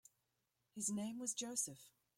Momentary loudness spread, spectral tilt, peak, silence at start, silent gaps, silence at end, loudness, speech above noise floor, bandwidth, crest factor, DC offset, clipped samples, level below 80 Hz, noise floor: 13 LU; -3 dB/octave; -28 dBFS; 0.75 s; none; 0.3 s; -43 LUFS; 42 dB; 16.5 kHz; 20 dB; under 0.1%; under 0.1%; -86 dBFS; -87 dBFS